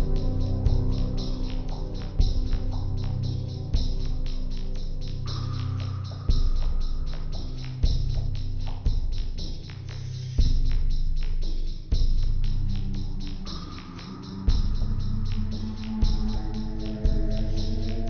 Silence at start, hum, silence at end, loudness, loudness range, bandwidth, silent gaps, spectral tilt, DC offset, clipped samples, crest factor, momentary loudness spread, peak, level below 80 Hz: 0 s; none; 0 s; -31 LUFS; 2 LU; 6.4 kHz; none; -7 dB/octave; under 0.1%; under 0.1%; 14 dB; 8 LU; -10 dBFS; -26 dBFS